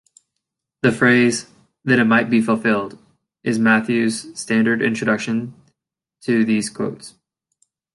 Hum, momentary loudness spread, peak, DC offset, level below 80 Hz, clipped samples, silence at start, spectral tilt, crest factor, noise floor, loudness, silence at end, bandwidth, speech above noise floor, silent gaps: none; 13 LU; -2 dBFS; under 0.1%; -62 dBFS; under 0.1%; 0.85 s; -5 dB/octave; 18 dB; -81 dBFS; -18 LUFS; 0.85 s; 11.5 kHz; 64 dB; none